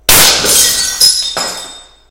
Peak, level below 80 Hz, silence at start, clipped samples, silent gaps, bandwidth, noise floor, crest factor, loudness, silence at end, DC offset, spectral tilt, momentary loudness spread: 0 dBFS; -34 dBFS; 0.1 s; 1%; none; over 20 kHz; -32 dBFS; 10 dB; -7 LUFS; 0.3 s; under 0.1%; 0.5 dB/octave; 16 LU